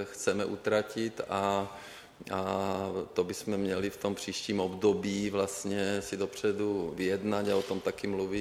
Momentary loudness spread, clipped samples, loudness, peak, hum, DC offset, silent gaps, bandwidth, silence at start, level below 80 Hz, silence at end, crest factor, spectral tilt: 5 LU; under 0.1%; -32 LUFS; -14 dBFS; none; under 0.1%; none; 16 kHz; 0 s; -64 dBFS; 0 s; 18 dB; -5 dB/octave